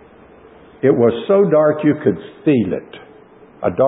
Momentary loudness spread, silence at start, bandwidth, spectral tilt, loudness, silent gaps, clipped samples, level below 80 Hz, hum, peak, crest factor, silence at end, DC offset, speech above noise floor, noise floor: 9 LU; 0.85 s; 4 kHz; -13 dB/octave; -16 LUFS; none; under 0.1%; -52 dBFS; none; -2 dBFS; 16 dB; 0 s; under 0.1%; 29 dB; -44 dBFS